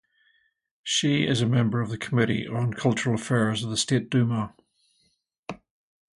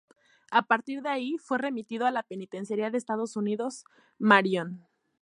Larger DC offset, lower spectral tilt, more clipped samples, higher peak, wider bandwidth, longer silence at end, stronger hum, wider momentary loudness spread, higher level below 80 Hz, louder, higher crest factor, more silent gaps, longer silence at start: neither; about the same, -5 dB/octave vs -5 dB/octave; neither; about the same, -6 dBFS vs -4 dBFS; about the same, 11.5 kHz vs 11 kHz; first, 0.65 s vs 0.45 s; neither; about the same, 17 LU vs 15 LU; first, -60 dBFS vs -82 dBFS; first, -25 LUFS vs -28 LUFS; second, 20 dB vs 26 dB; first, 5.38-5.43 s vs none; first, 0.85 s vs 0.5 s